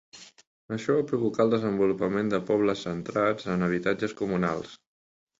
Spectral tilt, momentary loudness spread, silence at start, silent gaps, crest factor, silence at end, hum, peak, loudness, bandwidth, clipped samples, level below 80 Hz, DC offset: -7 dB/octave; 7 LU; 0.15 s; 0.47-0.68 s; 18 dB; 0.65 s; none; -10 dBFS; -27 LUFS; 7.8 kHz; under 0.1%; -60 dBFS; under 0.1%